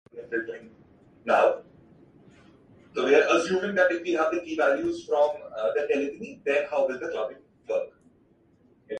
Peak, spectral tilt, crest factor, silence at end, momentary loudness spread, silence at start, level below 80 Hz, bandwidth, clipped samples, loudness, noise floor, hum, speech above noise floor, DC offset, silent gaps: -8 dBFS; -4.5 dB/octave; 20 dB; 0 s; 14 LU; 0.15 s; -68 dBFS; 9.4 kHz; under 0.1%; -26 LUFS; -62 dBFS; none; 36 dB; under 0.1%; none